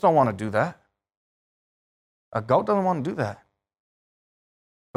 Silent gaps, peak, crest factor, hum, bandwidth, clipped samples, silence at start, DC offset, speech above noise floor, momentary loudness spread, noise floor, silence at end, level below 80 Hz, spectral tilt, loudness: 1.17-2.32 s; -8 dBFS; 20 dB; none; 12 kHz; under 0.1%; 0.05 s; under 0.1%; over 67 dB; 11 LU; under -90 dBFS; 1.6 s; -66 dBFS; -8 dB/octave; -25 LUFS